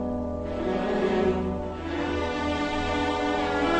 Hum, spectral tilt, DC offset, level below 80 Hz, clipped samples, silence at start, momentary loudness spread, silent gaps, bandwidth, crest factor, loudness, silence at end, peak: none; -6 dB/octave; under 0.1%; -40 dBFS; under 0.1%; 0 s; 6 LU; none; 9.2 kHz; 14 dB; -27 LUFS; 0 s; -12 dBFS